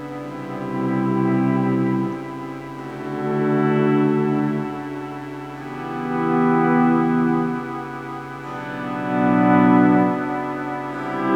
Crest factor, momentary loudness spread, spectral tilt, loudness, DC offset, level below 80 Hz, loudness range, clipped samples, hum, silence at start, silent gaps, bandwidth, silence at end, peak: 18 dB; 15 LU; -8.5 dB/octave; -20 LUFS; under 0.1%; -54 dBFS; 3 LU; under 0.1%; none; 0 s; none; 9 kHz; 0 s; -4 dBFS